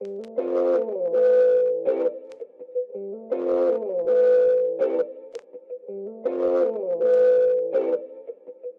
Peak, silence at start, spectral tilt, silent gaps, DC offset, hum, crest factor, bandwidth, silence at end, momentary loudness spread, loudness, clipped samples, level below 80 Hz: -12 dBFS; 0 s; -7 dB/octave; none; under 0.1%; none; 12 dB; 4.4 kHz; 0.05 s; 21 LU; -22 LUFS; under 0.1%; -74 dBFS